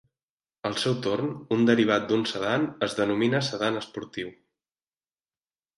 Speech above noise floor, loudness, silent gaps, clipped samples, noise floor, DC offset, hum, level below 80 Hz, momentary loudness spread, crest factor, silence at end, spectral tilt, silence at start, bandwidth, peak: over 64 dB; -26 LUFS; none; under 0.1%; under -90 dBFS; under 0.1%; none; -66 dBFS; 13 LU; 20 dB; 1.45 s; -5.5 dB/octave; 0.65 s; 11.5 kHz; -8 dBFS